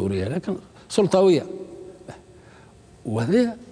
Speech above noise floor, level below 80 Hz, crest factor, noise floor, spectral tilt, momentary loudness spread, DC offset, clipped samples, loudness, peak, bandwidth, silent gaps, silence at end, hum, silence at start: 28 dB; -56 dBFS; 18 dB; -49 dBFS; -6.5 dB/octave; 23 LU; under 0.1%; under 0.1%; -22 LUFS; -6 dBFS; 10.5 kHz; none; 0.05 s; none; 0 s